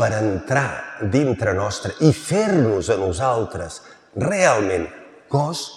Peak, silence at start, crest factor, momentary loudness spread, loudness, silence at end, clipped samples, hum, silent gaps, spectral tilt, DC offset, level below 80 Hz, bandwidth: -2 dBFS; 0 s; 18 dB; 11 LU; -20 LUFS; 0 s; under 0.1%; none; none; -5.5 dB/octave; under 0.1%; -50 dBFS; 13 kHz